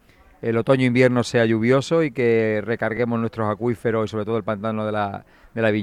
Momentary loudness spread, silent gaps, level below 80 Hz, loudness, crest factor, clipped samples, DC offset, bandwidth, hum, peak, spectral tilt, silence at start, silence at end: 7 LU; none; -56 dBFS; -21 LUFS; 18 dB; under 0.1%; under 0.1%; 11.5 kHz; none; -4 dBFS; -7 dB/octave; 0.45 s; 0 s